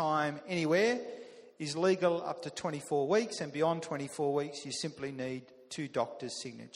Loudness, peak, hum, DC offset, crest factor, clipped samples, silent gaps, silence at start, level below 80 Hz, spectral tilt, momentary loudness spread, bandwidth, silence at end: -34 LUFS; -16 dBFS; none; under 0.1%; 18 dB; under 0.1%; none; 0 s; -76 dBFS; -4.5 dB/octave; 13 LU; 12.5 kHz; 0.1 s